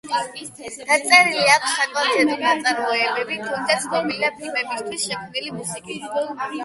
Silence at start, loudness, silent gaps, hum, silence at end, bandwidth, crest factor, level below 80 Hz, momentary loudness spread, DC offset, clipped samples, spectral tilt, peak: 0.05 s; -20 LUFS; none; none; 0 s; 12 kHz; 22 dB; -66 dBFS; 15 LU; under 0.1%; under 0.1%; -1.5 dB/octave; 0 dBFS